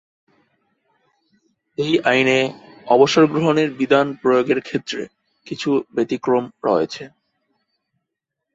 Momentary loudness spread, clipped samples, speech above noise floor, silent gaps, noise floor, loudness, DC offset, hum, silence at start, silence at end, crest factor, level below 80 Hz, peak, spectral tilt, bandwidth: 16 LU; under 0.1%; 63 dB; none; -81 dBFS; -18 LUFS; under 0.1%; none; 1.8 s; 1.45 s; 18 dB; -64 dBFS; -2 dBFS; -5.5 dB/octave; 8 kHz